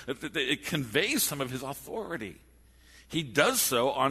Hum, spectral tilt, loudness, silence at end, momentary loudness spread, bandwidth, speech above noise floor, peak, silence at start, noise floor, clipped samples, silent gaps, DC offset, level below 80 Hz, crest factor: none; -3 dB/octave; -29 LUFS; 0 s; 13 LU; 13.5 kHz; 27 dB; -8 dBFS; 0 s; -57 dBFS; under 0.1%; none; under 0.1%; -60 dBFS; 22 dB